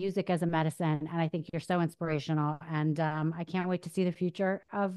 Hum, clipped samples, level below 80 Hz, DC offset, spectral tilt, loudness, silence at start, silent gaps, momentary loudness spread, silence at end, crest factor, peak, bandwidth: none; under 0.1%; -70 dBFS; under 0.1%; -7.5 dB/octave; -32 LUFS; 0 s; none; 3 LU; 0 s; 18 dB; -14 dBFS; 12.5 kHz